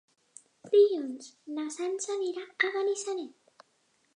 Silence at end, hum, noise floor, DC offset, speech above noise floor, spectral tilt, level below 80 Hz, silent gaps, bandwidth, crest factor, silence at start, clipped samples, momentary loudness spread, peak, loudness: 0.9 s; none; -71 dBFS; under 0.1%; 42 dB; -1.5 dB/octave; under -90 dBFS; none; 10.5 kHz; 20 dB; 0.65 s; under 0.1%; 16 LU; -12 dBFS; -30 LUFS